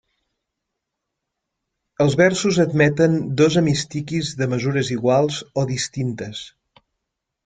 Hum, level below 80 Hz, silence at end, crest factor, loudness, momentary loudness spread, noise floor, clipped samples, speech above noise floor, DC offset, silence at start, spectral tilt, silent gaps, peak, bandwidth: none; -54 dBFS; 0.95 s; 20 dB; -19 LUFS; 10 LU; -80 dBFS; under 0.1%; 61 dB; under 0.1%; 2 s; -5.5 dB/octave; none; -2 dBFS; 9.4 kHz